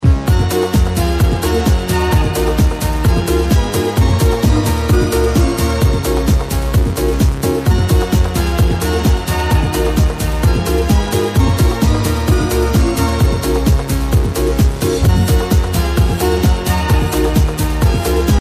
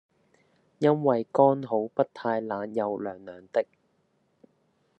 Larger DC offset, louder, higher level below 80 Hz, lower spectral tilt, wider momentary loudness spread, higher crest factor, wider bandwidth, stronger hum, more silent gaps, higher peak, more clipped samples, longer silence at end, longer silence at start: neither; first, -15 LUFS vs -27 LUFS; first, -16 dBFS vs -80 dBFS; second, -6 dB/octave vs -8.5 dB/octave; second, 2 LU vs 12 LU; second, 12 dB vs 22 dB; first, 15.5 kHz vs 8.2 kHz; neither; neither; first, -2 dBFS vs -6 dBFS; neither; second, 0 s vs 1.35 s; second, 0 s vs 0.8 s